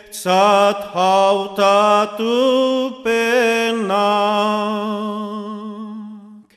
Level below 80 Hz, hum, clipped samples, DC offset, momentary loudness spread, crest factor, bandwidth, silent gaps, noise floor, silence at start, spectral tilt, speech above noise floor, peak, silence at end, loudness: -66 dBFS; none; under 0.1%; under 0.1%; 16 LU; 14 dB; 14.5 kHz; none; -38 dBFS; 0.1 s; -4 dB/octave; 22 dB; -2 dBFS; 0.15 s; -16 LUFS